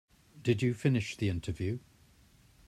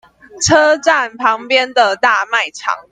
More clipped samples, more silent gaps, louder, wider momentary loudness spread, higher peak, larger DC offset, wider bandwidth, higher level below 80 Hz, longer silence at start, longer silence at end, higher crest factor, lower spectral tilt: neither; neither; second, -33 LUFS vs -13 LUFS; about the same, 8 LU vs 7 LU; second, -14 dBFS vs 0 dBFS; neither; first, 13.5 kHz vs 10 kHz; second, -58 dBFS vs -52 dBFS; about the same, 0.35 s vs 0.35 s; first, 0.9 s vs 0.1 s; first, 20 dB vs 14 dB; first, -7 dB/octave vs -2.5 dB/octave